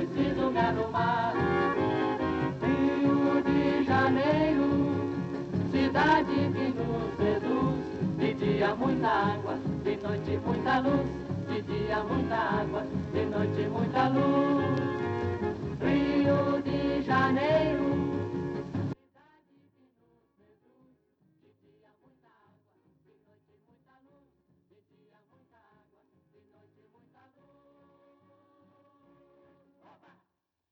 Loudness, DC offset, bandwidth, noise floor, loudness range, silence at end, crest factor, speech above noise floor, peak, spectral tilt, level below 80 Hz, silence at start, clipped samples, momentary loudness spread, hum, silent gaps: -28 LUFS; under 0.1%; 7.6 kHz; -81 dBFS; 4 LU; 11.75 s; 18 dB; 53 dB; -12 dBFS; -8 dB/octave; -54 dBFS; 0 s; under 0.1%; 8 LU; none; none